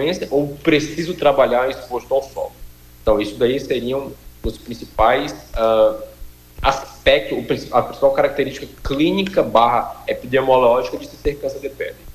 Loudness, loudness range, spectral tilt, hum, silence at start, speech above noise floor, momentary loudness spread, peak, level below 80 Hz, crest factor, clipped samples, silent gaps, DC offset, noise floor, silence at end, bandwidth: -18 LUFS; 3 LU; -5.5 dB/octave; 60 Hz at -45 dBFS; 0 s; 21 dB; 14 LU; -2 dBFS; -38 dBFS; 16 dB; under 0.1%; none; under 0.1%; -39 dBFS; 0.05 s; 15.5 kHz